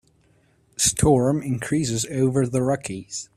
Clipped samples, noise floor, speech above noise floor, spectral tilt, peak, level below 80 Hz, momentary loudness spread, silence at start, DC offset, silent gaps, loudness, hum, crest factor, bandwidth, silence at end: under 0.1%; -61 dBFS; 39 dB; -5 dB/octave; -6 dBFS; -46 dBFS; 11 LU; 0.8 s; under 0.1%; none; -22 LUFS; none; 18 dB; 14.5 kHz; 0.1 s